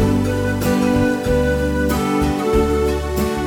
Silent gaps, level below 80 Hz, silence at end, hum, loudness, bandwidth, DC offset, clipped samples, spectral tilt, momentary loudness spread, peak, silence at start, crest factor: none; -26 dBFS; 0 s; none; -18 LUFS; 19 kHz; under 0.1%; under 0.1%; -6.5 dB/octave; 3 LU; -4 dBFS; 0 s; 14 dB